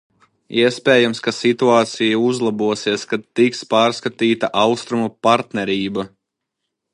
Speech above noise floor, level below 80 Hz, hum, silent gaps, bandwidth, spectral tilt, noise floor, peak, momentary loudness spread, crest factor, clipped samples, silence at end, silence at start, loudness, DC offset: 61 dB; -62 dBFS; none; none; 11 kHz; -4.5 dB/octave; -78 dBFS; 0 dBFS; 8 LU; 18 dB; under 0.1%; 0.85 s; 0.5 s; -18 LUFS; under 0.1%